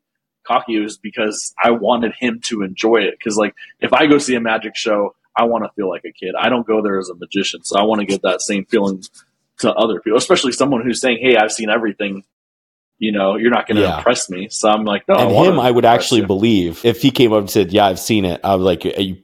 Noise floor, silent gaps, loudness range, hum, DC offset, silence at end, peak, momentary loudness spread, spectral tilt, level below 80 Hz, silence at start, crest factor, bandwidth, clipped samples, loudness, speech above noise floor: -41 dBFS; 12.33-12.92 s; 5 LU; none; under 0.1%; 0.05 s; 0 dBFS; 9 LU; -4.5 dB/octave; -52 dBFS; 0.45 s; 16 dB; 16 kHz; under 0.1%; -16 LUFS; 25 dB